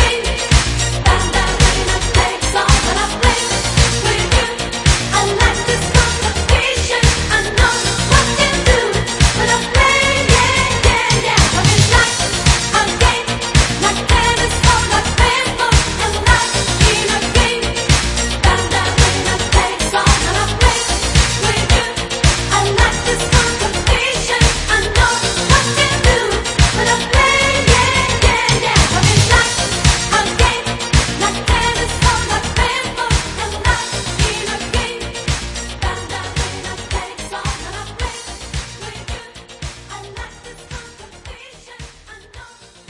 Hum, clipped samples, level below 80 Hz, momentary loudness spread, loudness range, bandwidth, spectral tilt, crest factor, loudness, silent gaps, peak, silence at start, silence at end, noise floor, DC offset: none; under 0.1%; -22 dBFS; 12 LU; 11 LU; 11.5 kHz; -3 dB/octave; 14 dB; -14 LUFS; none; 0 dBFS; 0 s; 0.45 s; -40 dBFS; under 0.1%